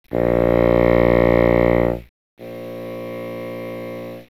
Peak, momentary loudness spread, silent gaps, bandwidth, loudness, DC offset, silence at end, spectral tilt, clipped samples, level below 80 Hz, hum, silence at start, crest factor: -4 dBFS; 18 LU; 2.09-2.37 s; 15 kHz; -16 LUFS; 0.2%; 0.15 s; -9 dB/octave; under 0.1%; -32 dBFS; 60 Hz at -40 dBFS; 0.1 s; 16 dB